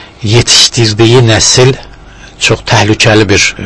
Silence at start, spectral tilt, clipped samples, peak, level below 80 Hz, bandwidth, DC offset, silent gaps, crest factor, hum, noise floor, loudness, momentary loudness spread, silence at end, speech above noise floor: 0 s; -3.5 dB/octave; 4%; 0 dBFS; -32 dBFS; 11 kHz; under 0.1%; none; 8 dB; none; -31 dBFS; -6 LUFS; 7 LU; 0 s; 25 dB